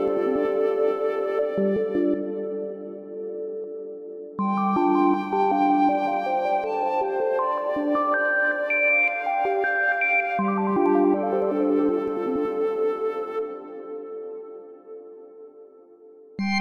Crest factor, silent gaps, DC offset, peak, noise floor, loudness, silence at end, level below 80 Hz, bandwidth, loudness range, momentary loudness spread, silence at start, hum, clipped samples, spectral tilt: 14 dB; none; under 0.1%; -10 dBFS; -49 dBFS; -23 LUFS; 0 s; -66 dBFS; 6.6 kHz; 8 LU; 16 LU; 0 s; none; under 0.1%; -7.5 dB/octave